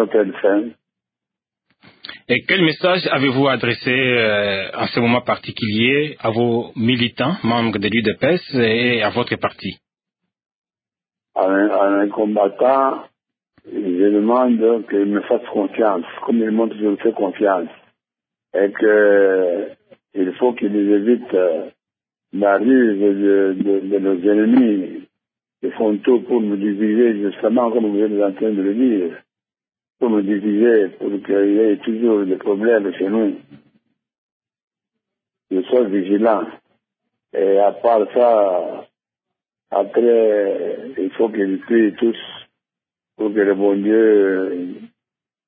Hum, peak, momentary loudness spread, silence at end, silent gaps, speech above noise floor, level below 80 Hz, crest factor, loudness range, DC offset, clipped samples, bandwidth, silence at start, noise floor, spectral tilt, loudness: none; -2 dBFS; 10 LU; 0.6 s; 10.55-10.62 s, 34.18-34.40 s, 34.63-34.68 s; over 73 dB; -62 dBFS; 16 dB; 4 LU; under 0.1%; under 0.1%; 5 kHz; 0 s; under -90 dBFS; -11 dB/octave; -17 LUFS